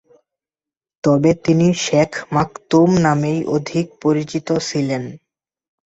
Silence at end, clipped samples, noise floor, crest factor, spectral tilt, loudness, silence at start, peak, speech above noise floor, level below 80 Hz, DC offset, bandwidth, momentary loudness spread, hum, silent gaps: 0.7 s; under 0.1%; under -90 dBFS; 16 dB; -6 dB/octave; -17 LUFS; 1.05 s; -2 dBFS; over 73 dB; -50 dBFS; under 0.1%; 8.2 kHz; 8 LU; none; none